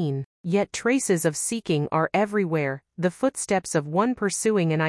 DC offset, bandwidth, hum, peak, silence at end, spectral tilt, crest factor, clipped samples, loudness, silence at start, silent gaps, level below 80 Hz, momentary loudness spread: under 0.1%; 12 kHz; none; -8 dBFS; 0 s; -5 dB/octave; 16 dB; under 0.1%; -24 LUFS; 0 s; 0.25-0.44 s; -64 dBFS; 5 LU